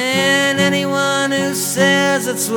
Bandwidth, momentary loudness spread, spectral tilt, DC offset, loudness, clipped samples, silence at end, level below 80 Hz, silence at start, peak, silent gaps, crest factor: 20 kHz; 4 LU; -3 dB/octave; under 0.1%; -15 LUFS; under 0.1%; 0 s; -62 dBFS; 0 s; 0 dBFS; none; 16 dB